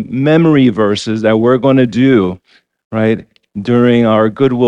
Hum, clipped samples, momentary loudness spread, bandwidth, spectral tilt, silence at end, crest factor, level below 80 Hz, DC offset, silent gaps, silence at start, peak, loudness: none; under 0.1%; 11 LU; 9.4 kHz; -7.5 dB/octave; 0 s; 12 dB; -48 dBFS; under 0.1%; 2.85-2.90 s; 0 s; 0 dBFS; -11 LUFS